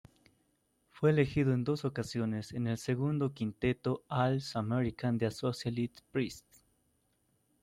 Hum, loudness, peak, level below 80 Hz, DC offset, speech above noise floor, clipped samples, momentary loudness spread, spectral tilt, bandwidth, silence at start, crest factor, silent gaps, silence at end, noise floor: none; -34 LUFS; -16 dBFS; -62 dBFS; under 0.1%; 43 dB; under 0.1%; 7 LU; -7 dB/octave; 13.5 kHz; 0.95 s; 18 dB; none; 1.25 s; -75 dBFS